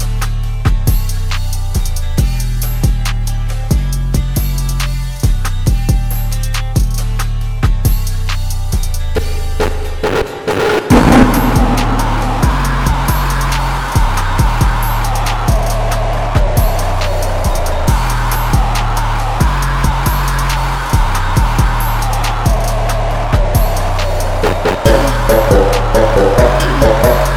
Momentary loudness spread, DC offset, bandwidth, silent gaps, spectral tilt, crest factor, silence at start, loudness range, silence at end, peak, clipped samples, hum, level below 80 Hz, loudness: 8 LU; under 0.1%; 16.5 kHz; none; -5.5 dB/octave; 12 dB; 0 s; 5 LU; 0 s; 0 dBFS; under 0.1%; none; -14 dBFS; -14 LUFS